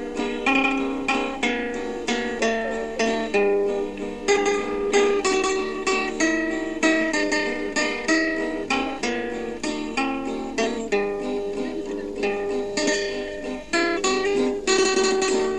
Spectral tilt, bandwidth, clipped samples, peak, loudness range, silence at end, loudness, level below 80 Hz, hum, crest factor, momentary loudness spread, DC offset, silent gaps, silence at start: -2.5 dB/octave; 11 kHz; under 0.1%; -6 dBFS; 4 LU; 0 s; -23 LUFS; -50 dBFS; none; 18 dB; 8 LU; 0.6%; none; 0 s